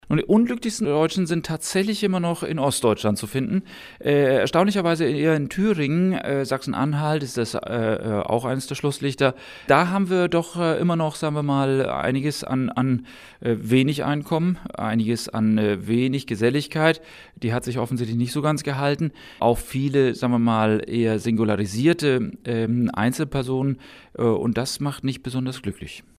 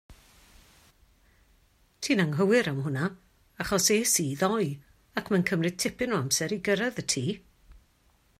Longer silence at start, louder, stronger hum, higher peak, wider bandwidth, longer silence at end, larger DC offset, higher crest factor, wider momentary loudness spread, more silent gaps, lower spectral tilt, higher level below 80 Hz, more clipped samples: about the same, 0.1 s vs 0.1 s; first, -22 LUFS vs -27 LUFS; neither; first, -2 dBFS vs -10 dBFS; about the same, 15.5 kHz vs 16 kHz; second, 0.2 s vs 0.65 s; neither; about the same, 20 dB vs 20 dB; second, 7 LU vs 12 LU; neither; first, -6 dB/octave vs -4 dB/octave; first, -50 dBFS vs -60 dBFS; neither